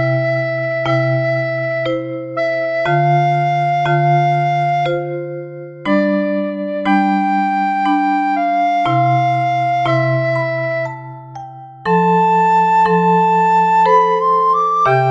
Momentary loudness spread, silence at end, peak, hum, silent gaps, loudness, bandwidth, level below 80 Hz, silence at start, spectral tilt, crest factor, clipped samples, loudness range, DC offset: 10 LU; 0 s; -2 dBFS; none; none; -15 LUFS; 7.6 kHz; -56 dBFS; 0 s; -8 dB/octave; 14 dB; under 0.1%; 4 LU; under 0.1%